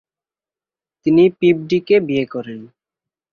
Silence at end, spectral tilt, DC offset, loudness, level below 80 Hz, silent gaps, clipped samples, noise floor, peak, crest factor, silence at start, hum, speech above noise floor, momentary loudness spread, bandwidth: 0.65 s; -8 dB/octave; under 0.1%; -16 LUFS; -60 dBFS; none; under 0.1%; under -90 dBFS; -2 dBFS; 16 dB; 1.05 s; none; over 75 dB; 16 LU; 6.6 kHz